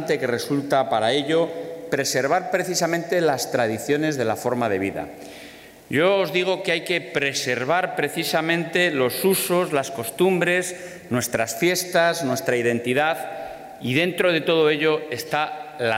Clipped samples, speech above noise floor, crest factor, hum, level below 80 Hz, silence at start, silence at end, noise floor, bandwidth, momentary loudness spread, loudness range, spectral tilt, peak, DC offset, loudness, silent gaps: under 0.1%; 21 dB; 16 dB; none; -64 dBFS; 0 s; 0 s; -43 dBFS; 16 kHz; 9 LU; 2 LU; -4 dB/octave; -6 dBFS; under 0.1%; -22 LUFS; none